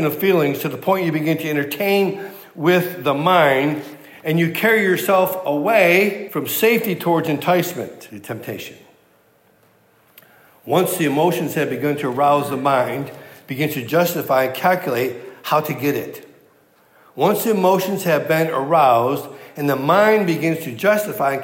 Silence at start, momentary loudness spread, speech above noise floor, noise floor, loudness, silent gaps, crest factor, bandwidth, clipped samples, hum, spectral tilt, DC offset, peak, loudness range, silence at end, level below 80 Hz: 0 s; 15 LU; 38 dB; -56 dBFS; -18 LUFS; none; 16 dB; 16.5 kHz; under 0.1%; none; -5.5 dB/octave; under 0.1%; -2 dBFS; 6 LU; 0 s; -74 dBFS